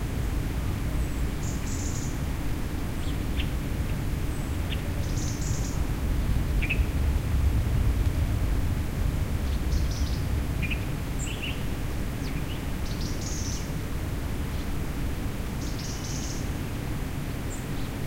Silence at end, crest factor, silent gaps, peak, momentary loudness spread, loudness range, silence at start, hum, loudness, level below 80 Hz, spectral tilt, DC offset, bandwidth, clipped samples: 0 s; 16 dB; none; -12 dBFS; 6 LU; 5 LU; 0 s; none; -30 LUFS; -30 dBFS; -5.5 dB/octave; under 0.1%; 16 kHz; under 0.1%